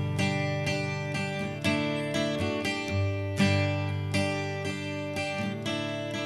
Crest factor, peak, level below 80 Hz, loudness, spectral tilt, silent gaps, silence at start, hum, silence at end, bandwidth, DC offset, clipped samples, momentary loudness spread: 18 dB; -12 dBFS; -60 dBFS; -29 LUFS; -5.5 dB/octave; none; 0 s; none; 0 s; 13 kHz; under 0.1%; under 0.1%; 5 LU